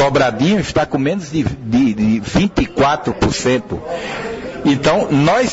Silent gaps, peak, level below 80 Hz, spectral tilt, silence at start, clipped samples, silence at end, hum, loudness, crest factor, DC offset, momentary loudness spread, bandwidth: none; -4 dBFS; -36 dBFS; -5.5 dB/octave; 0 s; under 0.1%; 0 s; none; -16 LUFS; 12 dB; under 0.1%; 10 LU; 8 kHz